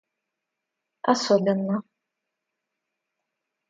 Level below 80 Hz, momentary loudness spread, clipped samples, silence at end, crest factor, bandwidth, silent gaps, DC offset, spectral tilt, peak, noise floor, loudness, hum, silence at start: -76 dBFS; 9 LU; under 0.1%; 1.9 s; 22 dB; 9.2 kHz; none; under 0.1%; -5.5 dB/octave; -6 dBFS; -84 dBFS; -24 LUFS; none; 1.05 s